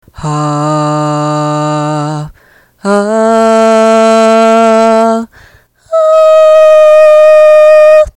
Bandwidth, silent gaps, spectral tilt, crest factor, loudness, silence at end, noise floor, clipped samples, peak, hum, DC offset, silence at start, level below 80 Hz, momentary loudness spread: 11 kHz; none; -6 dB/octave; 6 dB; -6 LUFS; 0.05 s; -44 dBFS; 4%; 0 dBFS; none; under 0.1%; 0.2 s; -40 dBFS; 12 LU